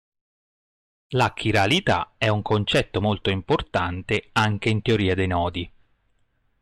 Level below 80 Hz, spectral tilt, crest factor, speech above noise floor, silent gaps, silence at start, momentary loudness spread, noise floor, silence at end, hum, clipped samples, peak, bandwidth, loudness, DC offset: -48 dBFS; -5.5 dB/octave; 14 dB; 44 dB; none; 1.1 s; 6 LU; -66 dBFS; 0.95 s; none; under 0.1%; -10 dBFS; 12.5 kHz; -23 LUFS; under 0.1%